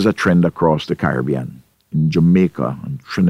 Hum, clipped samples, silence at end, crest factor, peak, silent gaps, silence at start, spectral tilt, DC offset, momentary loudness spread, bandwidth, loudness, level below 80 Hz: none; under 0.1%; 0 s; 14 dB; -2 dBFS; none; 0 s; -8 dB/octave; under 0.1%; 11 LU; 11 kHz; -17 LUFS; -44 dBFS